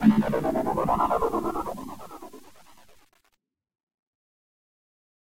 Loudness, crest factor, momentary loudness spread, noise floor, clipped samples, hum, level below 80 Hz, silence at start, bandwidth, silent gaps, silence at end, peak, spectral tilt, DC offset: -26 LUFS; 22 dB; 19 LU; -71 dBFS; under 0.1%; none; -50 dBFS; 0 s; 16 kHz; 3.83-3.87 s, 3.94-4.06 s; 1.25 s; -6 dBFS; -7.5 dB/octave; 0.5%